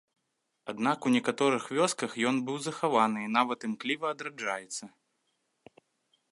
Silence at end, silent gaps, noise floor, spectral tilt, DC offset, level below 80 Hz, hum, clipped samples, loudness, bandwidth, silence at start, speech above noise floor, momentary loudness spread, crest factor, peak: 1.45 s; none; -80 dBFS; -4 dB/octave; under 0.1%; -82 dBFS; none; under 0.1%; -30 LUFS; 11.5 kHz; 0.65 s; 51 dB; 9 LU; 22 dB; -10 dBFS